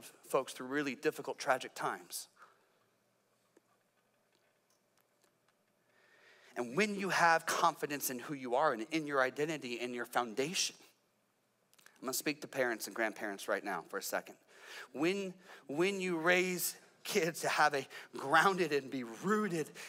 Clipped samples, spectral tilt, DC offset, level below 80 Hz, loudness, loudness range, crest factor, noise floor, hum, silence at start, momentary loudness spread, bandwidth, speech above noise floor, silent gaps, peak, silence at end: under 0.1%; -3.5 dB/octave; under 0.1%; under -90 dBFS; -35 LUFS; 9 LU; 22 dB; -77 dBFS; none; 0 s; 13 LU; 16 kHz; 42 dB; none; -16 dBFS; 0 s